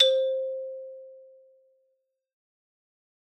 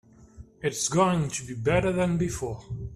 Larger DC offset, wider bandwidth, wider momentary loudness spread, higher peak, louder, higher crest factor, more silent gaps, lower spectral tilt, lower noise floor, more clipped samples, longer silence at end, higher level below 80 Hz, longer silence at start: neither; second, 8.6 kHz vs 14 kHz; first, 23 LU vs 10 LU; about the same, -6 dBFS vs -8 dBFS; about the same, -27 LUFS vs -27 LUFS; first, 26 dB vs 18 dB; neither; second, 2.5 dB/octave vs -5 dB/octave; first, -76 dBFS vs -49 dBFS; neither; first, 2.15 s vs 0 s; second, -86 dBFS vs -46 dBFS; second, 0 s vs 0.2 s